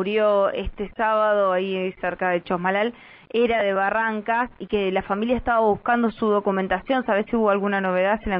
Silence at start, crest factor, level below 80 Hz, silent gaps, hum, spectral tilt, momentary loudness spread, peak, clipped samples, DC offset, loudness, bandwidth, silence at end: 0 s; 14 dB; -46 dBFS; none; none; -10 dB/octave; 6 LU; -8 dBFS; under 0.1%; under 0.1%; -22 LUFS; 5.4 kHz; 0 s